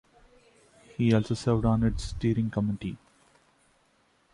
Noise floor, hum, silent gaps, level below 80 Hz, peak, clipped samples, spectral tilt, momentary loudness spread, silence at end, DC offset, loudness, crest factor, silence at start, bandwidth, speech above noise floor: -67 dBFS; none; none; -44 dBFS; -12 dBFS; under 0.1%; -7.5 dB/octave; 13 LU; 1.35 s; under 0.1%; -28 LUFS; 18 dB; 1 s; 11 kHz; 41 dB